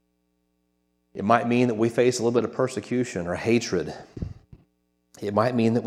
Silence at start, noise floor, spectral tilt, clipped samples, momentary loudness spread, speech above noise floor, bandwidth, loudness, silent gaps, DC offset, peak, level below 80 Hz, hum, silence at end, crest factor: 1.15 s; -72 dBFS; -6 dB/octave; under 0.1%; 15 LU; 48 dB; 13 kHz; -24 LUFS; none; under 0.1%; -2 dBFS; -52 dBFS; 60 Hz at -50 dBFS; 0 s; 22 dB